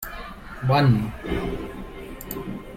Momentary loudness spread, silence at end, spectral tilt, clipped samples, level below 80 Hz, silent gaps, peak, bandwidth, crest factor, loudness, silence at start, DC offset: 19 LU; 0 s; -7 dB/octave; under 0.1%; -40 dBFS; none; -8 dBFS; 16 kHz; 18 dB; -24 LUFS; 0 s; under 0.1%